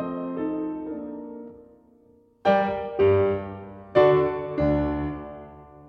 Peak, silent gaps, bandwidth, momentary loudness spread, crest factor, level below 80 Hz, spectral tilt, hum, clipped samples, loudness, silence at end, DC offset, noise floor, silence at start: -6 dBFS; none; 6 kHz; 20 LU; 20 dB; -44 dBFS; -9 dB/octave; none; under 0.1%; -24 LUFS; 0 s; under 0.1%; -58 dBFS; 0 s